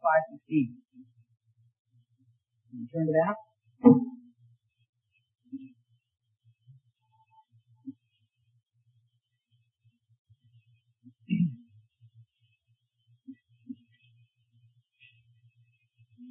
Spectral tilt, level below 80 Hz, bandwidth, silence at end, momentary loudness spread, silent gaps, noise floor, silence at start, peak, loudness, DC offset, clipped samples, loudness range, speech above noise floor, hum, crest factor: -5 dB/octave; -80 dBFS; 3.4 kHz; 0.05 s; 30 LU; 1.79-1.85 s, 4.89-4.93 s, 10.19-10.25 s; -76 dBFS; 0.05 s; -4 dBFS; -27 LUFS; under 0.1%; under 0.1%; 24 LU; 47 dB; none; 28 dB